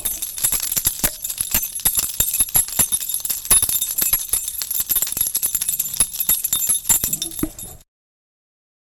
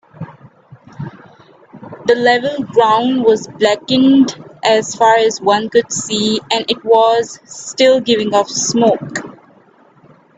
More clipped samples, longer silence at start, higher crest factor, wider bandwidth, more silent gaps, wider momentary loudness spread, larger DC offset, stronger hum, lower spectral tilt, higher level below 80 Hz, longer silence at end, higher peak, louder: neither; second, 0 s vs 0.2 s; first, 20 dB vs 14 dB; first, 18 kHz vs 9.2 kHz; neither; second, 7 LU vs 15 LU; neither; neither; second, 0 dB/octave vs -3.5 dB/octave; first, -40 dBFS vs -58 dBFS; about the same, 1.05 s vs 1.05 s; about the same, -2 dBFS vs 0 dBFS; second, -18 LUFS vs -13 LUFS